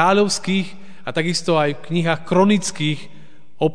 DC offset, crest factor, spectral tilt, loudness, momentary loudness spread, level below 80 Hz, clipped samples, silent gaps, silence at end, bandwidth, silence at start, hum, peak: 3%; 18 dB; -5 dB/octave; -19 LUFS; 10 LU; -60 dBFS; under 0.1%; none; 0 s; 10 kHz; 0 s; none; -2 dBFS